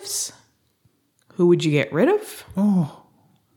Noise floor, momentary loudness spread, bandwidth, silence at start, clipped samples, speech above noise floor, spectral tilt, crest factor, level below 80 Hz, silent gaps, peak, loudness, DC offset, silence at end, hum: -64 dBFS; 12 LU; 18.5 kHz; 0 s; under 0.1%; 45 dB; -5.5 dB/octave; 16 dB; -62 dBFS; none; -6 dBFS; -21 LUFS; under 0.1%; 0.65 s; none